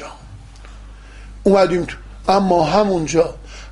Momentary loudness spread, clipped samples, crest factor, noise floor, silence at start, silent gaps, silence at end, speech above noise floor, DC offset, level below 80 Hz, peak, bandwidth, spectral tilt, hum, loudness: 13 LU; under 0.1%; 18 dB; -38 dBFS; 0 s; none; 0 s; 22 dB; under 0.1%; -38 dBFS; 0 dBFS; 11.5 kHz; -6 dB/octave; 50 Hz at -35 dBFS; -17 LUFS